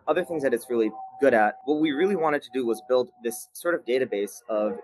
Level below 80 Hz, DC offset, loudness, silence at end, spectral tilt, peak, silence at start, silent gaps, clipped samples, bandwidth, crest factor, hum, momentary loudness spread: -74 dBFS; under 0.1%; -26 LUFS; 0 s; -5 dB/octave; -6 dBFS; 0.05 s; none; under 0.1%; 12.5 kHz; 18 dB; none; 8 LU